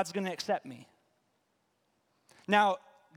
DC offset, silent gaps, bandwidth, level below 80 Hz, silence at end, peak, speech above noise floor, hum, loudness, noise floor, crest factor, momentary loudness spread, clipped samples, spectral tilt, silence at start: under 0.1%; none; 16.5 kHz; -82 dBFS; 0.4 s; -10 dBFS; 46 dB; none; -31 LUFS; -76 dBFS; 24 dB; 23 LU; under 0.1%; -4 dB/octave; 0 s